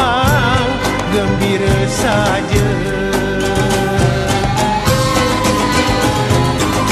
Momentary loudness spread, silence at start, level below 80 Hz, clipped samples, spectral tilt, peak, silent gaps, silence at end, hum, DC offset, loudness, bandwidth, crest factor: 3 LU; 0 s; -26 dBFS; under 0.1%; -5 dB/octave; 0 dBFS; none; 0 s; none; under 0.1%; -14 LUFS; 14 kHz; 14 dB